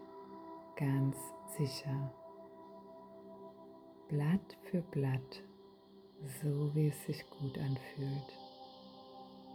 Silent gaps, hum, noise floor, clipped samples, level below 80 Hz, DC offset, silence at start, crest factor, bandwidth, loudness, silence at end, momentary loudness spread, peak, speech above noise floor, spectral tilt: none; none; -60 dBFS; under 0.1%; -72 dBFS; under 0.1%; 0 s; 16 dB; 19 kHz; -39 LUFS; 0 s; 20 LU; -24 dBFS; 23 dB; -7 dB/octave